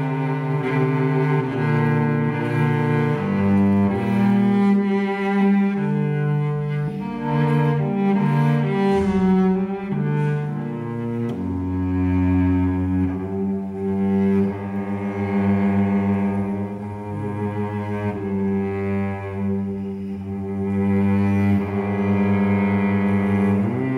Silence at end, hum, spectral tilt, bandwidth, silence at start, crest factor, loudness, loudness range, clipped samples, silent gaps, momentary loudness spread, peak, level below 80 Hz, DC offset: 0 s; none; -9.5 dB/octave; 5.2 kHz; 0 s; 12 dB; -21 LUFS; 5 LU; under 0.1%; none; 8 LU; -8 dBFS; -50 dBFS; under 0.1%